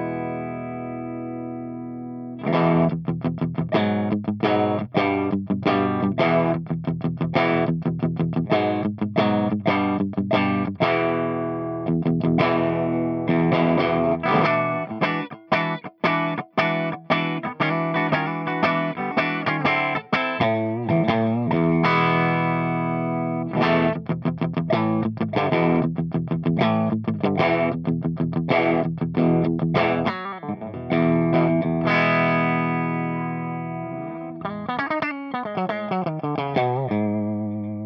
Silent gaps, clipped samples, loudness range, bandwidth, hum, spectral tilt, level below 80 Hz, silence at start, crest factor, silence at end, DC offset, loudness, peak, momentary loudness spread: none; under 0.1%; 4 LU; 6 kHz; none; -9 dB/octave; -58 dBFS; 0 s; 16 dB; 0 s; under 0.1%; -23 LUFS; -6 dBFS; 9 LU